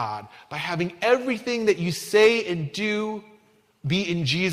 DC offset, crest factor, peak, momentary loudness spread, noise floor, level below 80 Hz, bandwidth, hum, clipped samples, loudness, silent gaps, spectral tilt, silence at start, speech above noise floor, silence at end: under 0.1%; 18 dB; -6 dBFS; 14 LU; -59 dBFS; -62 dBFS; 16 kHz; none; under 0.1%; -23 LUFS; none; -5 dB/octave; 0 s; 36 dB; 0 s